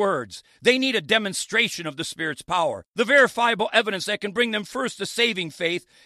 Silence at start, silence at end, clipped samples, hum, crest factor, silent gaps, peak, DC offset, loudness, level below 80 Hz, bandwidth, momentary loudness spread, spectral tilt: 0 s; 0.25 s; under 0.1%; none; 20 dB; 2.88-2.93 s; -4 dBFS; under 0.1%; -22 LUFS; -66 dBFS; 14.5 kHz; 10 LU; -3 dB/octave